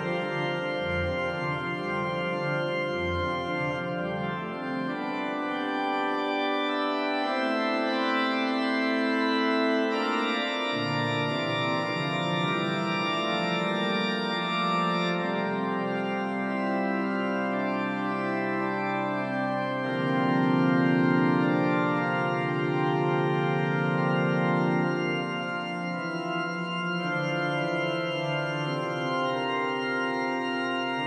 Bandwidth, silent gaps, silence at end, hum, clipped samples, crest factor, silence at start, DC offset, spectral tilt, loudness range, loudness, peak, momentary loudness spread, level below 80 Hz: 11 kHz; none; 0 s; none; under 0.1%; 16 dB; 0 s; under 0.1%; -6.5 dB/octave; 4 LU; -27 LUFS; -12 dBFS; 5 LU; -62 dBFS